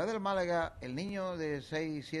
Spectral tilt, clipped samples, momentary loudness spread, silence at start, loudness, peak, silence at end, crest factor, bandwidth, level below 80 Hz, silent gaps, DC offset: -6 dB/octave; under 0.1%; 6 LU; 0 s; -36 LUFS; -22 dBFS; 0 s; 14 dB; 12 kHz; -60 dBFS; none; under 0.1%